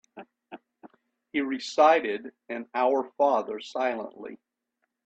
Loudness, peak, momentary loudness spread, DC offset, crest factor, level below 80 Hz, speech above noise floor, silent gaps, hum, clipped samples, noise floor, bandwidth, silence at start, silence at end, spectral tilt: -26 LUFS; -8 dBFS; 21 LU; under 0.1%; 20 dB; -78 dBFS; 54 dB; none; none; under 0.1%; -80 dBFS; 8.4 kHz; 0.15 s; 0.7 s; -3.5 dB/octave